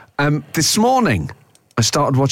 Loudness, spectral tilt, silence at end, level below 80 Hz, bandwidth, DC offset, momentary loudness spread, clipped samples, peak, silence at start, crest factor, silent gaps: -17 LUFS; -4.5 dB/octave; 0 s; -44 dBFS; 17 kHz; under 0.1%; 9 LU; under 0.1%; -6 dBFS; 0.2 s; 10 dB; none